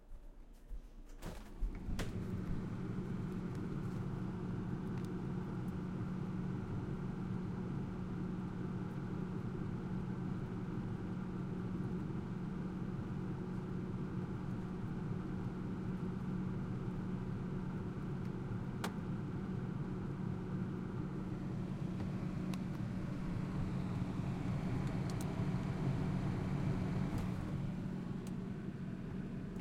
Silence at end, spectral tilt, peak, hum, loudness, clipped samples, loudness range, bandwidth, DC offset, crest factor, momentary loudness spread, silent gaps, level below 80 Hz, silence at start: 0 s; -8 dB/octave; -24 dBFS; none; -42 LUFS; under 0.1%; 3 LU; 13 kHz; under 0.1%; 16 dB; 4 LU; none; -52 dBFS; 0 s